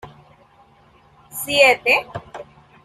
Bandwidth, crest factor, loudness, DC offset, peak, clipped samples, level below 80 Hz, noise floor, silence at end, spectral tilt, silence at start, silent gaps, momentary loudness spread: 15.5 kHz; 20 dB; -16 LUFS; under 0.1%; -2 dBFS; under 0.1%; -56 dBFS; -53 dBFS; 0.4 s; -2 dB/octave; 0.05 s; none; 24 LU